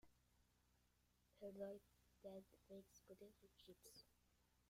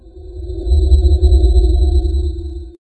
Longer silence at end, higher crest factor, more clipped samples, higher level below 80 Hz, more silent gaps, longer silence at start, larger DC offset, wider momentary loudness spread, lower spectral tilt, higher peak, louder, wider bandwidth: second, 0 s vs 0.2 s; first, 22 dB vs 12 dB; neither; second, -84 dBFS vs -14 dBFS; neither; about the same, 0.05 s vs 0.15 s; neither; second, 12 LU vs 16 LU; second, -5 dB/octave vs -9 dB/octave; second, -42 dBFS vs 0 dBFS; second, -62 LUFS vs -14 LUFS; first, 16 kHz vs 8.6 kHz